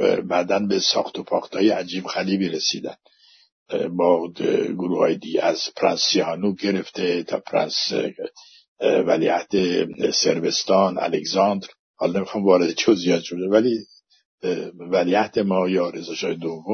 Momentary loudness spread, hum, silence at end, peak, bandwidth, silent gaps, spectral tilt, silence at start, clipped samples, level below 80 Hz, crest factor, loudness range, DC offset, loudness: 8 LU; none; 0 s; -4 dBFS; 6.6 kHz; 3.52-3.66 s, 8.68-8.76 s, 11.79-11.94 s, 14.25-14.38 s; -4 dB/octave; 0 s; under 0.1%; -68 dBFS; 18 dB; 3 LU; under 0.1%; -21 LUFS